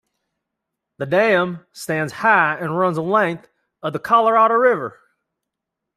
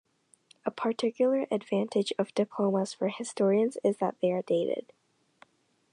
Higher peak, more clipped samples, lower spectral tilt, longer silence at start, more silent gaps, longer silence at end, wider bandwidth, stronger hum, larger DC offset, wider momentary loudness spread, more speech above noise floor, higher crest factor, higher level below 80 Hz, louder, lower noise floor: first, -2 dBFS vs -12 dBFS; neither; about the same, -6 dB/octave vs -6 dB/octave; first, 1 s vs 0.65 s; neither; about the same, 1.05 s vs 1.1 s; first, 14.5 kHz vs 11 kHz; neither; neither; first, 15 LU vs 6 LU; first, 64 dB vs 35 dB; about the same, 18 dB vs 18 dB; first, -66 dBFS vs -84 dBFS; first, -18 LUFS vs -29 LUFS; first, -82 dBFS vs -63 dBFS